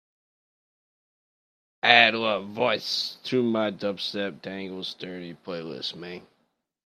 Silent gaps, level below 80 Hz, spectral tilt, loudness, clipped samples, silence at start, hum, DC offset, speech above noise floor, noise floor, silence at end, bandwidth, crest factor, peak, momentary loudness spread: none; -78 dBFS; -4 dB/octave; -24 LUFS; under 0.1%; 1.85 s; none; under 0.1%; 47 dB; -73 dBFS; 0.65 s; 14.5 kHz; 28 dB; 0 dBFS; 20 LU